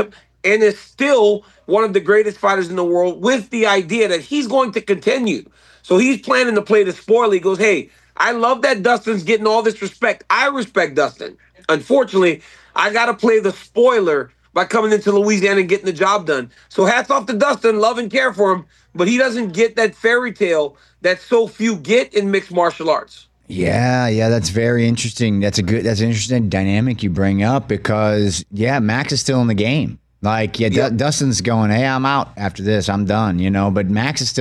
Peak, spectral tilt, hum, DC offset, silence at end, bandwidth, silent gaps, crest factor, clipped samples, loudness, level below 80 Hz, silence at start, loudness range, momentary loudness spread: -4 dBFS; -5 dB/octave; none; under 0.1%; 0 s; 12 kHz; none; 12 dB; under 0.1%; -16 LUFS; -50 dBFS; 0 s; 2 LU; 6 LU